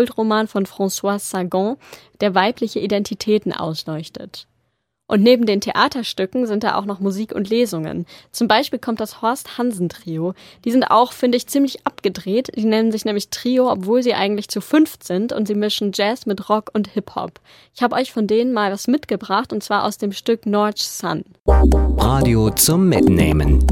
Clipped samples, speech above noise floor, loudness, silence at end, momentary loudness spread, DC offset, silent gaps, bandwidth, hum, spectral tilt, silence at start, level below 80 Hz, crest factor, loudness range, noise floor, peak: under 0.1%; 51 dB; -19 LUFS; 0 s; 11 LU; under 0.1%; 21.40-21.44 s; 17 kHz; none; -5 dB/octave; 0 s; -28 dBFS; 18 dB; 4 LU; -70 dBFS; 0 dBFS